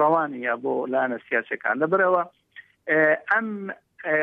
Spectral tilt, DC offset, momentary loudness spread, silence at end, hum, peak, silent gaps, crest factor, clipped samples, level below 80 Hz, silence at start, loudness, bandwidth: -8.5 dB/octave; under 0.1%; 14 LU; 0 s; none; -8 dBFS; none; 16 dB; under 0.1%; -80 dBFS; 0 s; -23 LUFS; 4.5 kHz